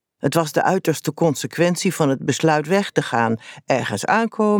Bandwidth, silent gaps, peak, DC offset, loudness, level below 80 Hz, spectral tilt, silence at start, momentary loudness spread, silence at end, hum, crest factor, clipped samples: over 20 kHz; none; -2 dBFS; under 0.1%; -20 LUFS; -66 dBFS; -5 dB/octave; 0.25 s; 4 LU; 0 s; none; 16 dB; under 0.1%